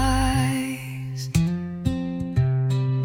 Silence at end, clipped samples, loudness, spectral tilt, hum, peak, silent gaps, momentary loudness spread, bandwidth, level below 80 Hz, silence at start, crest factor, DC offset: 0 s; under 0.1%; -25 LUFS; -6 dB/octave; none; -6 dBFS; none; 9 LU; 18 kHz; -34 dBFS; 0 s; 16 dB; under 0.1%